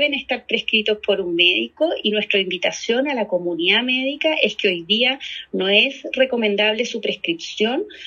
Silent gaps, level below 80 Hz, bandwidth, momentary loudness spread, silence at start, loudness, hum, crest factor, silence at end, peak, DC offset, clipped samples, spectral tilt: none; -64 dBFS; 7.4 kHz; 7 LU; 0 s; -19 LUFS; none; 20 dB; 0 s; 0 dBFS; under 0.1%; under 0.1%; -3.5 dB/octave